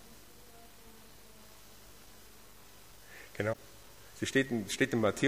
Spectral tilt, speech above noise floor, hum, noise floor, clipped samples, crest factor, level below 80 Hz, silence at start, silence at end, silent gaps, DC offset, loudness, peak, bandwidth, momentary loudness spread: -4.5 dB/octave; 25 dB; 50 Hz at -70 dBFS; -57 dBFS; under 0.1%; 22 dB; -64 dBFS; 0.05 s; 0 s; none; 0.1%; -33 LUFS; -16 dBFS; 15.5 kHz; 24 LU